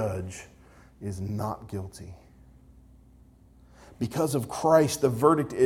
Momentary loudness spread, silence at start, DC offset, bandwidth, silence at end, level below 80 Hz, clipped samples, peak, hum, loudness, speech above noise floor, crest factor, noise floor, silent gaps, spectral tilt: 20 LU; 0 s; under 0.1%; 18.5 kHz; 0 s; -56 dBFS; under 0.1%; -6 dBFS; none; -27 LUFS; 29 dB; 22 dB; -55 dBFS; none; -6 dB/octave